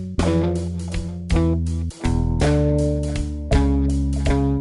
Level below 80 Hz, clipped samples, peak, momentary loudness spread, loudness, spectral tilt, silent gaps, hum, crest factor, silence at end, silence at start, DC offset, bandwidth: -24 dBFS; under 0.1%; -4 dBFS; 8 LU; -21 LUFS; -7.5 dB/octave; none; none; 16 dB; 0 s; 0 s; under 0.1%; 11.5 kHz